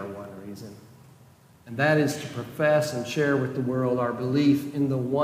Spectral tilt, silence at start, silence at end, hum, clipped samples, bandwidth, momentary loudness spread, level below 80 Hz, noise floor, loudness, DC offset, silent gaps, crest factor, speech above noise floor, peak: -6.5 dB/octave; 0 s; 0 s; none; under 0.1%; 16 kHz; 18 LU; -66 dBFS; -54 dBFS; -25 LUFS; under 0.1%; none; 16 dB; 30 dB; -10 dBFS